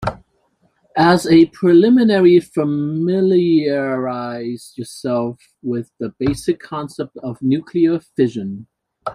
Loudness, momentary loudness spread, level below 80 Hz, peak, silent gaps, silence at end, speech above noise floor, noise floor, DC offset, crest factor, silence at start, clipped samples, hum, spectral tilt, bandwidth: -17 LUFS; 16 LU; -50 dBFS; -2 dBFS; none; 0 s; 46 dB; -62 dBFS; under 0.1%; 16 dB; 0 s; under 0.1%; none; -7 dB/octave; 12.5 kHz